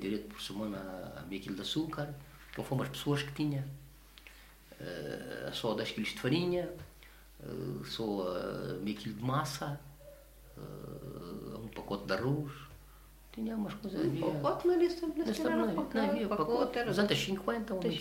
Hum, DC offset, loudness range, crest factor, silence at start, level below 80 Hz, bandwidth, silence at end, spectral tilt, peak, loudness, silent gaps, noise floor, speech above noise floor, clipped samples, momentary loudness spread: none; under 0.1%; 8 LU; 20 dB; 0 s; -58 dBFS; 16 kHz; 0 s; -6 dB/octave; -16 dBFS; -36 LUFS; none; -56 dBFS; 21 dB; under 0.1%; 19 LU